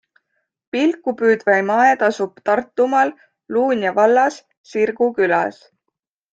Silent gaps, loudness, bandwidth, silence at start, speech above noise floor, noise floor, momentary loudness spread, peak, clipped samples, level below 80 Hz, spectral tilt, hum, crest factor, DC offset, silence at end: 4.57-4.64 s; -18 LUFS; 8 kHz; 0.75 s; 61 dB; -78 dBFS; 7 LU; -2 dBFS; under 0.1%; -66 dBFS; -5 dB/octave; none; 16 dB; under 0.1%; 0.8 s